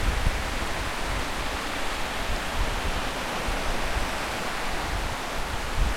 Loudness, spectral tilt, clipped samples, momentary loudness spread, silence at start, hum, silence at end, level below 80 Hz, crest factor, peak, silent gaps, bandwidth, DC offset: -29 LUFS; -3.5 dB/octave; under 0.1%; 1 LU; 0 s; none; 0 s; -32 dBFS; 18 dB; -10 dBFS; none; 16.5 kHz; under 0.1%